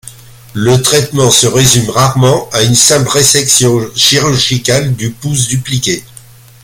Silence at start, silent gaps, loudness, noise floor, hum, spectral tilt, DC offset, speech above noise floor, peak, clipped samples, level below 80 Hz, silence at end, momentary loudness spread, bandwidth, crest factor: 0.05 s; none; -9 LUFS; -36 dBFS; none; -3.5 dB/octave; under 0.1%; 27 dB; 0 dBFS; 0.2%; -38 dBFS; 0.6 s; 9 LU; over 20 kHz; 10 dB